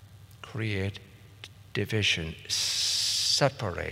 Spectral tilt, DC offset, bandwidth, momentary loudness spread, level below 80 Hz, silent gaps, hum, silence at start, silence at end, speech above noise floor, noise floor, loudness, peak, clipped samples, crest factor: -2.5 dB/octave; under 0.1%; 16 kHz; 23 LU; -58 dBFS; none; none; 0 s; 0 s; 20 dB; -49 dBFS; -27 LUFS; -6 dBFS; under 0.1%; 24 dB